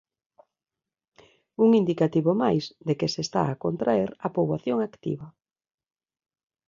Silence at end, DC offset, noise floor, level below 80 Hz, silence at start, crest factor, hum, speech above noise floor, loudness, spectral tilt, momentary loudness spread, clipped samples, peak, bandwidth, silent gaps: 1.4 s; under 0.1%; -90 dBFS; -64 dBFS; 1.6 s; 18 dB; none; 66 dB; -25 LUFS; -7 dB/octave; 10 LU; under 0.1%; -8 dBFS; 7.6 kHz; none